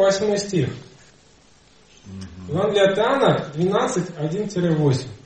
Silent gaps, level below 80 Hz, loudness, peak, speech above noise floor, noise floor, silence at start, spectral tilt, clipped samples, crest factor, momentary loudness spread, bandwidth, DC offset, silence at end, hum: none; -56 dBFS; -21 LUFS; -4 dBFS; 33 dB; -53 dBFS; 0 s; -5.5 dB/octave; under 0.1%; 18 dB; 19 LU; 8.8 kHz; 0.1%; 0.1 s; none